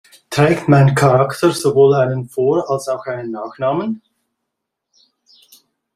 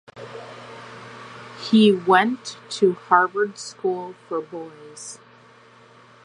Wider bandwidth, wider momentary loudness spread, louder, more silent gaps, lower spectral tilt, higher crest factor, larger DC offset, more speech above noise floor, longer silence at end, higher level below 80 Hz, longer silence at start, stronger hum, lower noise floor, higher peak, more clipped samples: first, 14.5 kHz vs 10.5 kHz; second, 13 LU vs 23 LU; first, -15 LUFS vs -20 LUFS; neither; first, -6.5 dB/octave vs -5 dB/octave; second, 16 dB vs 22 dB; neither; first, 63 dB vs 29 dB; first, 2 s vs 1.1 s; first, -54 dBFS vs -74 dBFS; first, 0.3 s vs 0.15 s; neither; first, -78 dBFS vs -50 dBFS; about the same, -2 dBFS vs -2 dBFS; neither